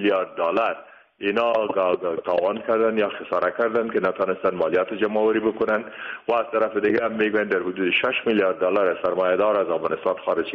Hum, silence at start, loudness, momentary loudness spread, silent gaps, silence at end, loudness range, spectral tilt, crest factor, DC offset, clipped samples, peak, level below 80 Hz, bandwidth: none; 0 s; -22 LUFS; 4 LU; none; 0 s; 2 LU; -3 dB/octave; 14 dB; under 0.1%; under 0.1%; -10 dBFS; -64 dBFS; 5.8 kHz